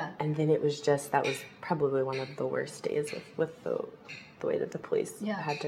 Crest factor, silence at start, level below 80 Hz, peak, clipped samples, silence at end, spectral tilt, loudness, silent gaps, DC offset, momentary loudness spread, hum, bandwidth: 20 dB; 0 s; -74 dBFS; -12 dBFS; under 0.1%; 0 s; -5.5 dB/octave; -32 LUFS; none; under 0.1%; 9 LU; none; 15.5 kHz